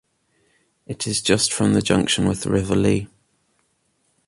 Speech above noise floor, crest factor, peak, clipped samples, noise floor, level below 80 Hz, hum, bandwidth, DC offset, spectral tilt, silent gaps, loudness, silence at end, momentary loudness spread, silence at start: 48 dB; 20 dB; -4 dBFS; under 0.1%; -67 dBFS; -44 dBFS; none; 11.5 kHz; under 0.1%; -4.5 dB/octave; none; -20 LUFS; 1.2 s; 9 LU; 0.9 s